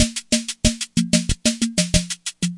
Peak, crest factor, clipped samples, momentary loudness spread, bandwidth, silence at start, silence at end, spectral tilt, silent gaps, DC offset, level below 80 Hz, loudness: 0 dBFS; 22 dB; under 0.1%; 4 LU; 11.5 kHz; 0 s; 0 s; -3.5 dB/octave; none; under 0.1%; -32 dBFS; -20 LUFS